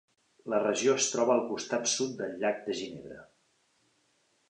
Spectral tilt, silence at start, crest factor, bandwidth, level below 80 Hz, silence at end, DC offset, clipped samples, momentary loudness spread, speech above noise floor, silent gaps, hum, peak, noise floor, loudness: -2.5 dB/octave; 0.45 s; 18 dB; 10.5 kHz; -76 dBFS; 1.25 s; under 0.1%; under 0.1%; 19 LU; 42 dB; none; none; -14 dBFS; -72 dBFS; -30 LUFS